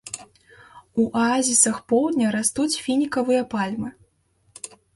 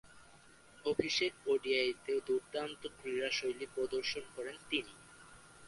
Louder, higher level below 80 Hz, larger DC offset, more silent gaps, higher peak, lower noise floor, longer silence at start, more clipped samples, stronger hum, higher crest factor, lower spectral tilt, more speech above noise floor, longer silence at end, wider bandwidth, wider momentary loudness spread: first, -21 LUFS vs -37 LUFS; first, -60 dBFS vs -70 dBFS; neither; neither; first, -4 dBFS vs -16 dBFS; about the same, -64 dBFS vs -61 dBFS; about the same, 0.05 s vs 0.05 s; neither; neither; about the same, 20 dB vs 22 dB; about the same, -3 dB/octave vs -3 dB/octave; first, 43 dB vs 24 dB; first, 0.3 s vs 0 s; about the same, 12 kHz vs 11.5 kHz; first, 18 LU vs 14 LU